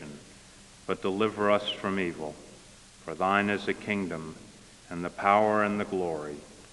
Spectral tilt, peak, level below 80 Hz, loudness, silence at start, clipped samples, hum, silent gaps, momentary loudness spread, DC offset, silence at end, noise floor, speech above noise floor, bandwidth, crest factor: -5.5 dB/octave; -8 dBFS; -62 dBFS; -28 LUFS; 0 s; under 0.1%; none; none; 20 LU; under 0.1%; 0 s; -52 dBFS; 24 dB; 11.5 kHz; 24 dB